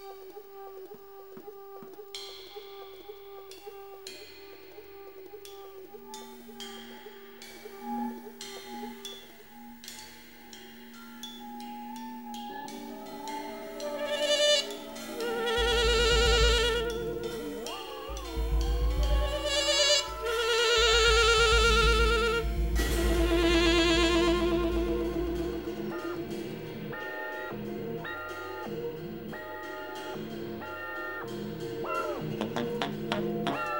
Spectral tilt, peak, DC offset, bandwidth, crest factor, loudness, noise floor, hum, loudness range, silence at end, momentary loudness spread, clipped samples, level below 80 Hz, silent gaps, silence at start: -3.5 dB/octave; -10 dBFS; 0.1%; 16 kHz; 20 dB; -28 LUFS; -50 dBFS; none; 21 LU; 0 s; 23 LU; under 0.1%; -36 dBFS; none; 0 s